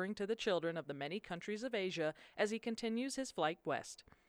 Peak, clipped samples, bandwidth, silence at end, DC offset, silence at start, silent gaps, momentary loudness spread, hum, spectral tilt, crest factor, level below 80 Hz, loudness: -22 dBFS; under 0.1%; 14.5 kHz; 0.25 s; under 0.1%; 0 s; none; 6 LU; none; -4 dB/octave; 18 dB; -76 dBFS; -40 LUFS